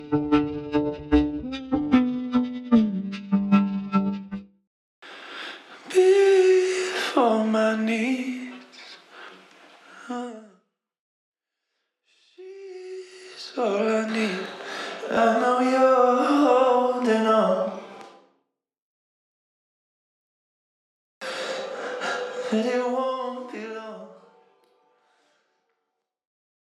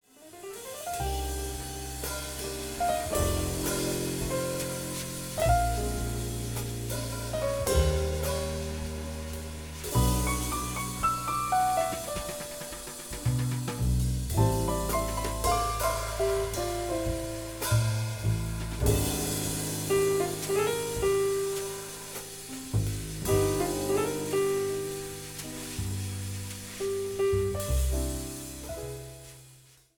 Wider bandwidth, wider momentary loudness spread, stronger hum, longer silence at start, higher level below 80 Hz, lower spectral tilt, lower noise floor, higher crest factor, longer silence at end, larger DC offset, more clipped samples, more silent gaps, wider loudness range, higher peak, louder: second, 12 kHz vs 19.5 kHz; first, 21 LU vs 11 LU; neither; second, 0 s vs 0.2 s; second, -50 dBFS vs -38 dBFS; first, -6 dB/octave vs -4.5 dB/octave; first, -81 dBFS vs -56 dBFS; about the same, 18 dB vs 18 dB; first, 2.6 s vs 0.35 s; neither; neither; first, 4.67-5.02 s, 10.99-11.32 s, 18.82-21.21 s vs none; first, 20 LU vs 3 LU; first, -6 dBFS vs -12 dBFS; first, -23 LUFS vs -30 LUFS